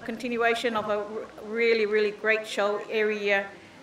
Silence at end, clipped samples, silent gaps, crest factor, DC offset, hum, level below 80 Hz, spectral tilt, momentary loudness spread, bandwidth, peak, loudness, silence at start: 0 s; under 0.1%; none; 18 dB; under 0.1%; none; -68 dBFS; -4 dB/octave; 10 LU; 13.5 kHz; -10 dBFS; -26 LUFS; 0 s